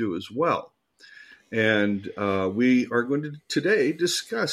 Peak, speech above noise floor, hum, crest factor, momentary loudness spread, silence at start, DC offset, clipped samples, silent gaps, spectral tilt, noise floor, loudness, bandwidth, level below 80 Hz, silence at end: -8 dBFS; 27 dB; none; 18 dB; 8 LU; 0 s; under 0.1%; under 0.1%; none; -4.5 dB/octave; -51 dBFS; -24 LUFS; 14 kHz; -70 dBFS; 0 s